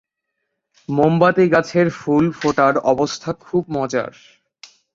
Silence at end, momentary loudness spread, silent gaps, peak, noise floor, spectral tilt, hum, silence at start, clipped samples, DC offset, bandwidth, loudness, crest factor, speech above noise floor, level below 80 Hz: 0.85 s; 10 LU; none; -2 dBFS; -76 dBFS; -6.5 dB/octave; none; 0.9 s; under 0.1%; under 0.1%; 7.8 kHz; -18 LUFS; 18 dB; 59 dB; -54 dBFS